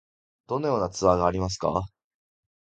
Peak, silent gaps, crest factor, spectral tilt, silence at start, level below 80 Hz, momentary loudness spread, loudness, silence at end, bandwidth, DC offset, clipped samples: -6 dBFS; none; 22 dB; -6 dB/octave; 0.5 s; -46 dBFS; 10 LU; -26 LUFS; 0.85 s; 9.2 kHz; under 0.1%; under 0.1%